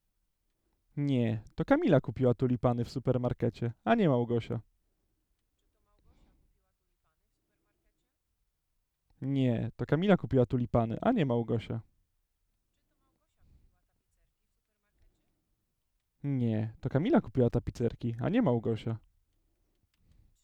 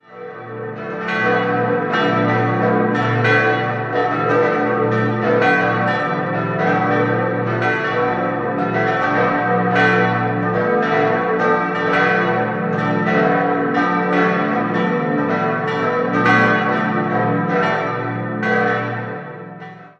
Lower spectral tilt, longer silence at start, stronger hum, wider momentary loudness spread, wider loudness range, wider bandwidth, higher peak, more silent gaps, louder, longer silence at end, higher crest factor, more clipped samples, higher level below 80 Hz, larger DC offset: first, -9 dB/octave vs -7.5 dB/octave; first, 0.95 s vs 0.1 s; second, none vs 60 Hz at -40 dBFS; first, 10 LU vs 7 LU; first, 10 LU vs 2 LU; about the same, 8.2 kHz vs 7.8 kHz; second, -10 dBFS vs -2 dBFS; neither; second, -30 LUFS vs -17 LUFS; first, 1.45 s vs 0.1 s; first, 22 dB vs 16 dB; neither; about the same, -56 dBFS vs -54 dBFS; neither